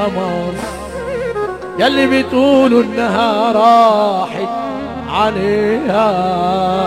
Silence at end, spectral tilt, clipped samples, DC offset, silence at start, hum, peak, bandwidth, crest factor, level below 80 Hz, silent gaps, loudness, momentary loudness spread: 0 s; -6 dB/octave; under 0.1%; 0.2%; 0 s; none; 0 dBFS; 13.5 kHz; 14 dB; -42 dBFS; none; -14 LUFS; 12 LU